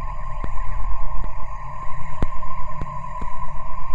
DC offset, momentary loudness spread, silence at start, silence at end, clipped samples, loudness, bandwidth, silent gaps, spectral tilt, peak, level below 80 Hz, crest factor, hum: under 0.1%; 4 LU; 0 s; 0 s; under 0.1%; -32 LUFS; 3 kHz; none; -7.5 dB/octave; -6 dBFS; -26 dBFS; 10 dB; none